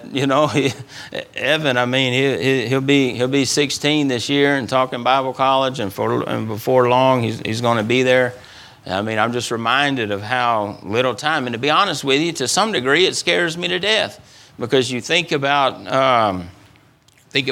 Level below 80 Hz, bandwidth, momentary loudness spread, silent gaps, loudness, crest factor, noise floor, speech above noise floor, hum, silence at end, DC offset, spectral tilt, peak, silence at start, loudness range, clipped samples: -60 dBFS; 17.5 kHz; 8 LU; none; -18 LUFS; 18 dB; -53 dBFS; 35 dB; none; 0 s; under 0.1%; -4 dB/octave; 0 dBFS; 0 s; 2 LU; under 0.1%